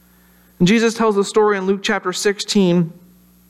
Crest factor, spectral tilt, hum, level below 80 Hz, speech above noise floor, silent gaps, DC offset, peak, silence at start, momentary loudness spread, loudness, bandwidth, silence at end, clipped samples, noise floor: 14 dB; -5 dB/octave; none; -54 dBFS; 35 dB; none; under 0.1%; -4 dBFS; 0.6 s; 5 LU; -17 LUFS; 13.5 kHz; 0.6 s; under 0.1%; -51 dBFS